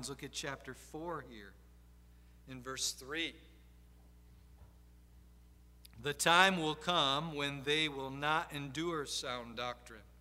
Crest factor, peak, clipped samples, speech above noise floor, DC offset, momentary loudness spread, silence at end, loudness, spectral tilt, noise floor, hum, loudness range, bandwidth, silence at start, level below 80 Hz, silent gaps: 30 dB; -10 dBFS; under 0.1%; 24 dB; under 0.1%; 19 LU; 0.05 s; -35 LUFS; -2.5 dB/octave; -60 dBFS; 60 Hz at -60 dBFS; 11 LU; 16 kHz; 0 s; -60 dBFS; none